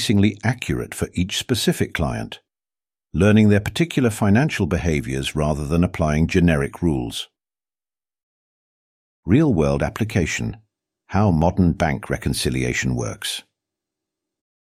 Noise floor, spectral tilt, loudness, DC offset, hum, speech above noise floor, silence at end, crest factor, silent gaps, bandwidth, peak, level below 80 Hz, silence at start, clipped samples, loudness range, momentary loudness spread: under -90 dBFS; -6 dB/octave; -20 LUFS; under 0.1%; none; over 71 dB; 1.25 s; 18 dB; 8.23-9.23 s; 15.5 kHz; -4 dBFS; -36 dBFS; 0 s; under 0.1%; 4 LU; 10 LU